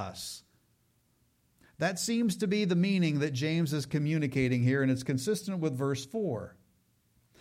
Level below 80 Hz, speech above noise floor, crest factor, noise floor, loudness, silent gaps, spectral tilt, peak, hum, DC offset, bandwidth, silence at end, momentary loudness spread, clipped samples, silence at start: -66 dBFS; 41 dB; 14 dB; -71 dBFS; -30 LUFS; none; -6 dB/octave; -18 dBFS; none; under 0.1%; 16 kHz; 0.9 s; 10 LU; under 0.1%; 0 s